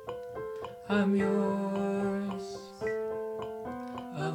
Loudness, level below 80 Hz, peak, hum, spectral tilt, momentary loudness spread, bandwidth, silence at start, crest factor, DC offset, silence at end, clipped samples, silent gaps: -33 LUFS; -64 dBFS; -16 dBFS; none; -7 dB/octave; 12 LU; 11 kHz; 0 s; 16 dB; under 0.1%; 0 s; under 0.1%; none